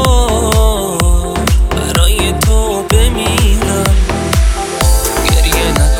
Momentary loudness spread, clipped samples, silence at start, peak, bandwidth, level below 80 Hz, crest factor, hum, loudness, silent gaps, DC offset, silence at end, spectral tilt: 3 LU; 0.1%; 0 s; 0 dBFS; 18 kHz; -12 dBFS; 10 dB; none; -12 LUFS; none; under 0.1%; 0 s; -4.5 dB/octave